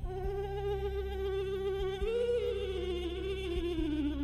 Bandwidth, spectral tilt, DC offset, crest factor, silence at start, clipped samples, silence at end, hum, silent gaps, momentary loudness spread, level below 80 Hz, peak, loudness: 14 kHz; -7 dB/octave; under 0.1%; 12 dB; 0 s; under 0.1%; 0 s; none; none; 5 LU; -42 dBFS; -22 dBFS; -35 LUFS